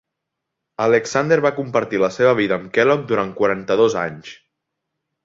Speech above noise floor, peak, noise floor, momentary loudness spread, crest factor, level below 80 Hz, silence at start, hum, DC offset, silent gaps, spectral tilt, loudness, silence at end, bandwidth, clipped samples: 62 dB; -2 dBFS; -80 dBFS; 7 LU; 16 dB; -58 dBFS; 0.8 s; none; under 0.1%; none; -5.5 dB/octave; -18 LUFS; 0.9 s; 7.8 kHz; under 0.1%